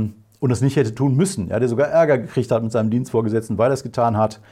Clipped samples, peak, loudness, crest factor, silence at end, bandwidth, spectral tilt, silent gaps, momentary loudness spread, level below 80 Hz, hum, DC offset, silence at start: under 0.1%; -4 dBFS; -19 LUFS; 14 dB; 0.15 s; 14 kHz; -7 dB/octave; none; 5 LU; -56 dBFS; none; under 0.1%; 0 s